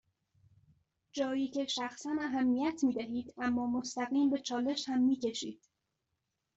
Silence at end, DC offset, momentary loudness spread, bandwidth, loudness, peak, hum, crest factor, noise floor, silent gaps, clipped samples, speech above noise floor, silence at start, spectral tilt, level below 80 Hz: 1 s; under 0.1%; 7 LU; 8 kHz; -34 LUFS; -20 dBFS; none; 14 dB; -85 dBFS; none; under 0.1%; 52 dB; 1.15 s; -3.5 dB/octave; -74 dBFS